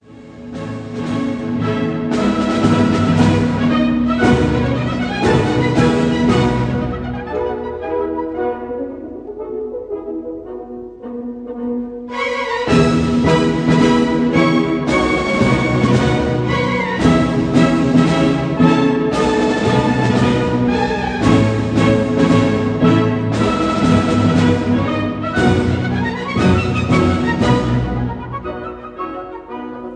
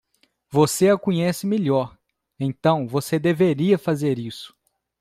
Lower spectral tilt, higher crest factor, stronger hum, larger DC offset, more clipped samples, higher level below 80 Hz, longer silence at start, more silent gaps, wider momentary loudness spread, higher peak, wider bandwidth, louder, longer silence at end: about the same, -7 dB/octave vs -6 dB/octave; about the same, 16 dB vs 16 dB; neither; neither; neither; first, -34 dBFS vs -60 dBFS; second, 0.1 s vs 0.5 s; neither; about the same, 13 LU vs 11 LU; first, 0 dBFS vs -4 dBFS; second, 10 kHz vs 16 kHz; first, -16 LUFS vs -21 LUFS; second, 0 s vs 0.55 s